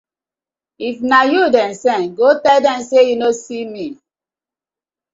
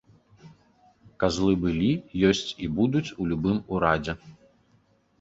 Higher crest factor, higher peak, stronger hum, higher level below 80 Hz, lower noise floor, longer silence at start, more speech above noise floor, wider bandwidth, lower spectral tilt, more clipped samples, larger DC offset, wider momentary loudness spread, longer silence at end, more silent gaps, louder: second, 16 dB vs 22 dB; first, 0 dBFS vs -6 dBFS; neither; second, -62 dBFS vs -48 dBFS; first, -90 dBFS vs -64 dBFS; first, 0.8 s vs 0.45 s; first, 76 dB vs 39 dB; about the same, 7.8 kHz vs 8 kHz; second, -3.5 dB/octave vs -6 dB/octave; neither; neither; first, 14 LU vs 6 LU; first, 1.2 s vs 0.9 s; neither; first, -14 LUFS vs -25 LUFS